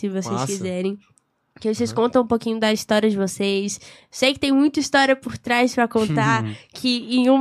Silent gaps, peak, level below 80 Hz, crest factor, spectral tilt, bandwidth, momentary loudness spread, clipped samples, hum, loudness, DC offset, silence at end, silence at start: none; -4 dBFS; -58 dBFS; 16 dB; -4.5 dB/octave; 14.5 kHz; 9 LU; under 0.1%; none; -21 LUFS; under 0.1%; 0 s; 0 s